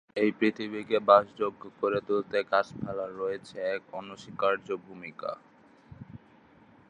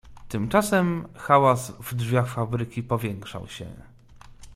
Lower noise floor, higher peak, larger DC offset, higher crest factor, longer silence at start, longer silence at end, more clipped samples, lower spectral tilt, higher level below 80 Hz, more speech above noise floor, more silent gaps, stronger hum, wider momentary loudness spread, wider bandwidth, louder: first, -58 dBFS vs -48 dBFS; about the same, -6 dBFS vs -4 dBFS; neither; about the same, 24 dB vs 22 dB; about the same, 0.15 s vs 0.05 s; first, 0.7 s vs 0 s; neither; about the same, -6 dB/octave vs -6 dB/octave; second, -68 dBFS vs -52 dBFS; first, 29 dB vs 23 dB; neither; neither; about the same, 20 LU vs 18 LU; second, 9.8 kHz vs 16 kHz; second, -29 LUFS vs -24 LUFS